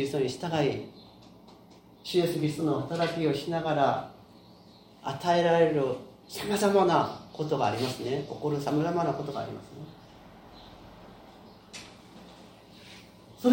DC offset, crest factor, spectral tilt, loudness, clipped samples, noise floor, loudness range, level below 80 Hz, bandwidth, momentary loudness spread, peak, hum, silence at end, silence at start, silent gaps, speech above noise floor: under 0.1%; 22 dB; -6 dB/octave; -28 LUFS; under 0.1%; -54 dBFS; 18 LU; -64 dBFS; 16.5 kHz; 26 LU; -8 dBFS; none; 0 s; 0 s; none; 26 dB